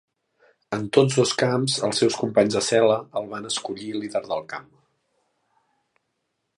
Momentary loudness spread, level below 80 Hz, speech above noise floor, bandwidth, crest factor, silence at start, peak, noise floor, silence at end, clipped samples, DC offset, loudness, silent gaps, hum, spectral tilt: 11 LU; -66 dBFS; 54 dB; 11.5 kHz; 22 dB; 0.7 s; -2 dBFS; -77 dBFS; 1.95 s; under 0.1%; under 0.1%; -23 LUFS; none; none; -4.5 dB/octave